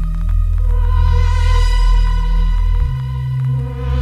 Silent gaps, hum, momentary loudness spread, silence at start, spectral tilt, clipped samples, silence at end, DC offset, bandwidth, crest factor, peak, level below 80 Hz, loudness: none; none; 5 LU; 0 s; -6.5 dB/octave; under 0.1%; 0 s; under 0.1%; 7.4 kHz; 10 dB; -4 dBFS; -14 dBFS; -17 LUFS